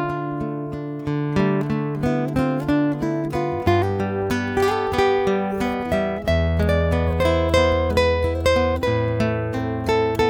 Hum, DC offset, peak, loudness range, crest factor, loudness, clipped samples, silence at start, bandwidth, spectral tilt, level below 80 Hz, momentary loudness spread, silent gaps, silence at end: none; under 0.1%; -4 dBFS; 3 LU; 16 dB; -21 LUFS; under 0.1%; 0 s; 17 kHz; -7 dB/octave; -34 dBFS; 6 LU; none; 0 s